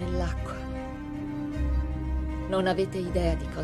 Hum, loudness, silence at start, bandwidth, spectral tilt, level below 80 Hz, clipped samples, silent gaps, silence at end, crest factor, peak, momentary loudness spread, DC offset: none; -30 LUFS; 0 s; 11.5 kHz; -7 dB/octave; -32 dBFS; under 0.1%; none; 0 s; 16 dB; -12 dBFS; 9 LU; under 0.1%